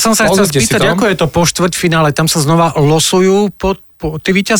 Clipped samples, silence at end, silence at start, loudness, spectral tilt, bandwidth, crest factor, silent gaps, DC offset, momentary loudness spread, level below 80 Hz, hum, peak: under 0.1%; 0 s; 0 s; -11 LUFS; -4 dB/octave; 19 kHz; 10 dB; none; under 0.1%; 8 LU; -36 dBFS; none; -2 dBFS